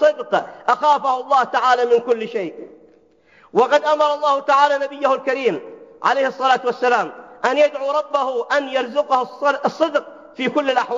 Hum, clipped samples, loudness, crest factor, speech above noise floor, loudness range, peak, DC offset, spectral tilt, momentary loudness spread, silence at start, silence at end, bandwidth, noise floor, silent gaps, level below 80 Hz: none; under 0.1%; -18 LUFS; 16 dB; 35 dB; 2 LU; -2 dBFS; under 0.1%; -3.5 dB/octave; 7 LU; 0 s; 0 s; 7.6 kHz; -53 dBFS; none; -74 dBFS